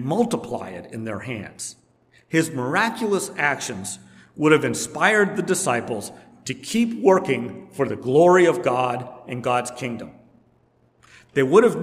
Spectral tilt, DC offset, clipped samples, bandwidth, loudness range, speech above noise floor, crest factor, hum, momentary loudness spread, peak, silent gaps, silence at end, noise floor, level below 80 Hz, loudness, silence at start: -4.5 dB/octave; under 0.1%; under 0.1%; 15.5 kHz; 5 LU; 40 dB; 20 dB; none; 17 LU; -2 dBFS; none; 0 s; -61 dBFS; -66 dBFS; -21 LUFS; 0 s